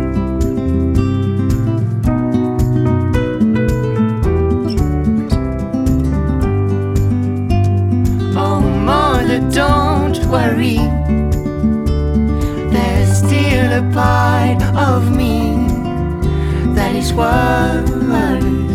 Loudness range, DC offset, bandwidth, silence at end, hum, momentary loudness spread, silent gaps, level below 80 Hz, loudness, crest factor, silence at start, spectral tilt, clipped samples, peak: 2 LU; under 0.1%; 15 kHz; 0 s; none; 4 LU; none; -22 dBFS; -15 LUFS; 14 dB; 0 s; -7 dB/octave; under 0.1%; 0 dBFS